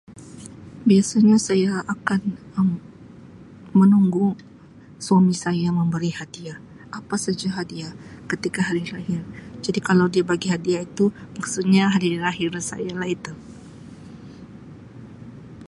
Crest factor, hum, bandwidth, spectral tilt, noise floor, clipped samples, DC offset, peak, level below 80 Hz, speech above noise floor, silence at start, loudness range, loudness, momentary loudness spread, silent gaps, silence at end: 20 dB; none; 11.5 kHz; -6 dB/octave; -46 dBFS; under 0.1%; under 0.1%; -2 dBFS; -56 dBFS; 25 dB; 0.1 s; 7 LU; -21 LUFS; 24 LU; none; 0 s